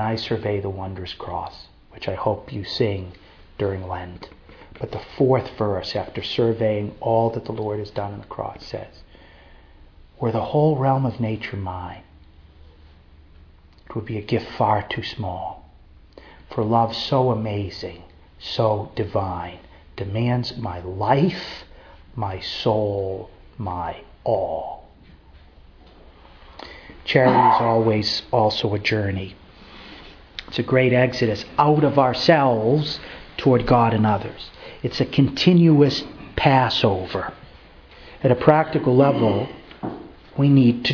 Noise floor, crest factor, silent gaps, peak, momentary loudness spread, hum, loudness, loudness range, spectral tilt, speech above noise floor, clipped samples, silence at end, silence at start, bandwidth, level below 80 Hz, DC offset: -48 dBFS; 22 dB; none; 0 dBFS; 19 LU; none; -21 LUFS; 9 LU; -7.5 dB/octave; 28 dB; under 0.1%; 0 s; 0 s; 5.4 kHz; -48 dBFS; under 0.1%